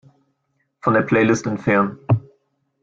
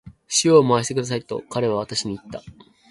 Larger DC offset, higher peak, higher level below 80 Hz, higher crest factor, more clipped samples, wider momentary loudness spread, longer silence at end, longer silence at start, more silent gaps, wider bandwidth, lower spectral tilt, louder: neither; about the same, -4 dBFS vs -2 dBFS; about the same, -54 dBFS vs -56 dBFS; about the same, 18 dB vs 20 dB; neither; second, 5 LU vs 17 LU; first, 0.65 s vs 0.4 s; first, 0.85 s vs 0.05 s; neither; second, 7.6 kHz vs 11.5 kHz; first, -7 dB/octave vs -4 dB/octave; about the same, -19 LUFS vs -20 LUFS